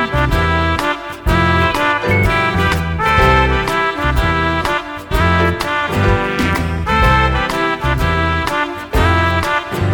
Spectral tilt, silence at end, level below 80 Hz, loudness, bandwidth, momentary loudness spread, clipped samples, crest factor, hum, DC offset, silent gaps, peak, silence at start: -5.5 dB/octave; 0 s; -22 dBFS; -15 LUFS; 18.5 kHz; 5 LU; under 0.1%; 14 dB; none; under 0.1%; none; 0 dBFS; 0 s